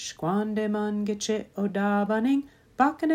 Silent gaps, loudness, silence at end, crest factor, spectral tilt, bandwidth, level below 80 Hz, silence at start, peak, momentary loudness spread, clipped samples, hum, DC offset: none; -27 LUFS; 0 s; 18 dB; -5.5 dB/octave; 15 kHz; -64 dBFS; 0 s; -8 dBFS; 5 LU; under 0.1%; none; under 0.1%